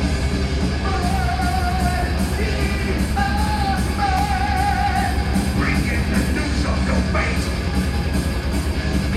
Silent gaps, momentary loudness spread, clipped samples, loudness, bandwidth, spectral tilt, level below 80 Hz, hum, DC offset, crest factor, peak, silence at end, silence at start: none; 2 LU; under 0.1%; -21 LUFS; 14 kHz; -5.5 dB/octave; -24 dBFS; none; under 0.1%; 12 dB; -6 dBFS; 0 s; 0 s